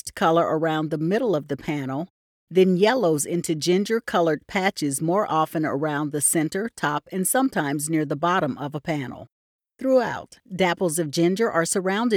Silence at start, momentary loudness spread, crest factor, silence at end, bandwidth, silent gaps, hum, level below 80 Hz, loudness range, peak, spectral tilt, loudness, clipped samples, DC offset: 0.05 s; 9 LU; 16 dB; 0 s; 18.5 kHz; 2.10-2.47 s, 9.32-9.59 s; none; -64 dBFS; 3 LU; -8 dBFS; -4.5 dB/octave; -23 LUFS; under 0.1%; under 0.1%